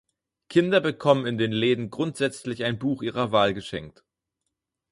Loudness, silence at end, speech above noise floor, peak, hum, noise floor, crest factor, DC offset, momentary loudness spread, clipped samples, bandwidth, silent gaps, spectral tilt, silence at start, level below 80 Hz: -24 LUFS; 1 s; 58 dB; -4 dBFS; none; -82 dBFS; 22 dB; under 0.1%; 8 LU; under 0.1%; 11.5 kHz; none; -6 dB/octave; 0.5 s; -60 dBFS